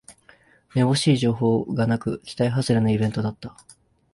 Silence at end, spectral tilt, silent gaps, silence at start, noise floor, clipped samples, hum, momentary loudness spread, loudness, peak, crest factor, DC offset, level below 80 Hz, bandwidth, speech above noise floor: 0.65 s; -6.5 dB/octave; none; 0.1 s; -55 dBFS; under 0.1%; none; 11 LU; -22 LUFS; -8 dBFS; 16 dB; under 0.1%; -54 dBFS; 11.5 kHz; 34 dB